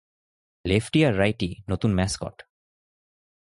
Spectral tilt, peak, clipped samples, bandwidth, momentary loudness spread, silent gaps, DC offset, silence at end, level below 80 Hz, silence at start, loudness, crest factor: -6 dB/octave; -6 dBFS; under 0.1%; 11.5 kHz; 12 LU; none; under 0.1%; 1.1 s; -44 dBFS; 0.65 s; -24 LUFS; 20 dB